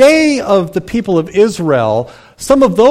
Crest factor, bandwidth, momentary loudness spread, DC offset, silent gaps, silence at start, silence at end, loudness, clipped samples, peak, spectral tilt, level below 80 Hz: 10 dB; 15.5 kHz; 9 LU; under 0.1%; none; 0 s; 0 s; -12 LUFS; under 0.1%; 0 dBFS; -5.5 dB/octave; -40 dBFS